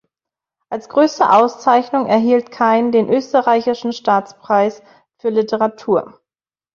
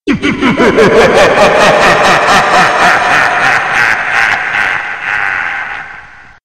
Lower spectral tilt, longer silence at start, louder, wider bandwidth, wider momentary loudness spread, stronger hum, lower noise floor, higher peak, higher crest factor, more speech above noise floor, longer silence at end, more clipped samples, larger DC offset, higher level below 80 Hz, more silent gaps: first, -5.5 dB/octave vs -3.5 dB/octave; first, 0.7 s vs 0.05 s; second, -16 LUFS vs -8 LUFS; second, 7.2 kHz vs 16.5 kHz; about the same, 8 LU vs 8 LU; neither; first, under -90 dBFS vs -33 dBFS; about the same, -2 dBFS vs 0 dBFS; first, 16 dB vs 8 dB; first, over 75 dB vs 26 dB; first, 0.7 s vs 0.4 s; second, under 0.1% vs 0.7%; second, under 0.1% vs 0.9%; second, -62 dBFS vs -36 dBFS; neither